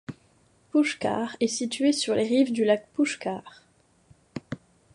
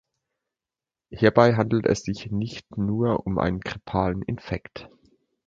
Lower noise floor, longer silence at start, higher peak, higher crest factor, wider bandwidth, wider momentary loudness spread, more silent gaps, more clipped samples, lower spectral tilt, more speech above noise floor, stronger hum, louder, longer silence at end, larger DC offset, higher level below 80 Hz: second, -62 dBFS vs under -90 dBFS; second, 0.1 s vs 1.1 s; second, -10 dBFS vs -2 dBFS; second, 18 dB vs 24 dB; first, 11.5 kHz vs 7.6 kHz; first, 18 LU vs 14 LU; neither; neither; second, -4 dB/octave vs -7 dB/octave; second, 37 dB vs over 66 dB; neither; about the same, -25 LUFS vs -24 LUFS; second, 0.4 s vs 0.6 s; neither; second, -68 dBFS vs -46 dBFS